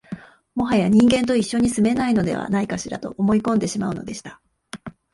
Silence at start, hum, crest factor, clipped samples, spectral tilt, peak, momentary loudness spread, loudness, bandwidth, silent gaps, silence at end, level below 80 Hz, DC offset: 0.1 s; none; 16 dB; under 0.1%; -5.5 dB/octave; -4 dBFS; 21 LU; -20 LUFS; 11.5 kHz; none; 0.25 s; -48 dBFS; under 0.1%